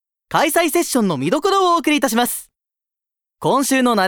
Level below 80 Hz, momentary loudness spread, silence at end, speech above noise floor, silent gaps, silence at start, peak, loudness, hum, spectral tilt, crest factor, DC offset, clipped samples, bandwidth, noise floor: -56 dBFS; 6 LU; 0 s; 70 dB; none; 0.3 s; -2 dBFS; -17 LUFS; none; -3.5 dB/octave; 16 dB; under 0.1%; under 0.1%; over 20 kHz; -87 dBFS